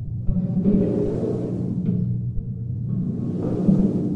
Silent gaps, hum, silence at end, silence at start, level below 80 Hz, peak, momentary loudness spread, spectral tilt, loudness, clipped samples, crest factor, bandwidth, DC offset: none; none; 0 s; 0 s; -36 dBFS; -6 dBFS; 8 LU; -11.5 dB/octave; -23 LUFS; under 0.1%; 16 dB; 3.2 kHz; under 0.1%